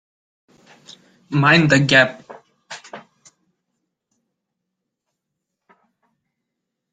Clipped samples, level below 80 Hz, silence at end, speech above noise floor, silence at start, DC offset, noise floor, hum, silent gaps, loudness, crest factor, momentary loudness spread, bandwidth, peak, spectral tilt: under 0.1%; -60 dBFS; 3.95 s; 65 dB; 1.3 s; under 0.1%; -80 dBFS; none; none; -14 LUFS; 22 dB; 24 LU; 9.4 kHz; -2 dBFS; -5 dB/octave